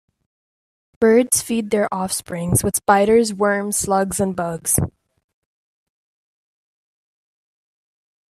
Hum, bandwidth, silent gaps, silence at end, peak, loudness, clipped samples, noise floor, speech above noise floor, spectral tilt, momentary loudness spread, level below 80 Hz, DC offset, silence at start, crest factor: none; 15.5 kHz; none; 3.4 s; 0 dBFS; -18 LUFS; under 0.1%; under -90 dBFS; over 72 dB; -4.5 dB/octave; 9 LU; -48 dBFS; under 0.1%; 1 s; 20 dB